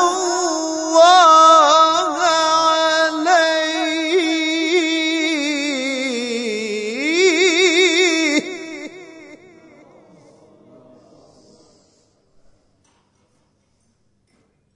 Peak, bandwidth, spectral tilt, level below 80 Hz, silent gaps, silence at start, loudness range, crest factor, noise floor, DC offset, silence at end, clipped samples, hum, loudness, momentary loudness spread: -2 dBFS; 11 kHz; -1 dB/octave; -70 dBFS; none; 0 s; 7 LU; 16 dB; -63 dBFS; under 0.1%; 5.4 s; under 0.1%; none; -15 LUFS; 13 LU